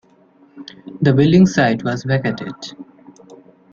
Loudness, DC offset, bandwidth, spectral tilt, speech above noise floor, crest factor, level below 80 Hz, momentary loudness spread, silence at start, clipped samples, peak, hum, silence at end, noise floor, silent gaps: -16 LUFS; under 0.1%; 7.6 kHz; -7 dB/octave; 35 dB; 16 dB; -52 dBFS; 24 LU; 0.55 s; under 0.1%; -2 dBFS; none; 0.35 s; -51 dBFS; none